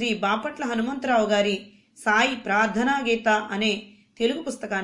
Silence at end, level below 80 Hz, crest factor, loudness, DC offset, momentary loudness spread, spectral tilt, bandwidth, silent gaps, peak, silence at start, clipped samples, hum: 0 s; -60 dBFS; 16 dB; -24 LUFS; under 0.1%; 8 LU; -4 dB/octave; 11.5 kHz; none; -8 dBFS; 0 s; under 0.1%; none